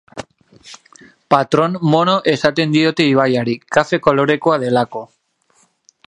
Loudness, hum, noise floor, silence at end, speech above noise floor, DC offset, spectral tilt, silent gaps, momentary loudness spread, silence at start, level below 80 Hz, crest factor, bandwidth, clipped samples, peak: -15 LUFS; none; -58 dBFS; 1.05 s; 44 dB; under 0.1%; -6 dB/octave; none; 5 LU; 0.15 s; -56 dBFS; 16 dB; 10.5 kHz; under 0.1%; 0 dBFS